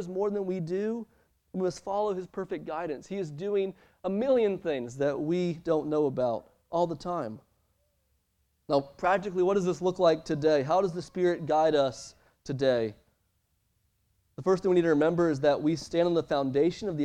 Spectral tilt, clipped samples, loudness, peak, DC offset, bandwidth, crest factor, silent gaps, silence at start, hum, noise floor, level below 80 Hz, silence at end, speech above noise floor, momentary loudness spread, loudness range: -6.5 dB/octave; under 0.1%; -29 LUFS; -10 dBFS; under 0.1%; 10 kHz; 18 dB; none; 0 s; none; -74 dBFS; -62 dBFS; 0 s; 46 dB; 11 LU; 6 LU